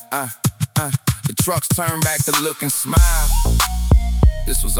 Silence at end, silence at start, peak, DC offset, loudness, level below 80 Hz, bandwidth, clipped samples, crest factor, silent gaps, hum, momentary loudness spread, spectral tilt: 0 s; 0 s; -2 dBFS; under 0.1%; -18 LUFS; -20 dBFS; 18 kHz; under 0.1%; 16 dB; none; none; 6 LU; -4 dB/octave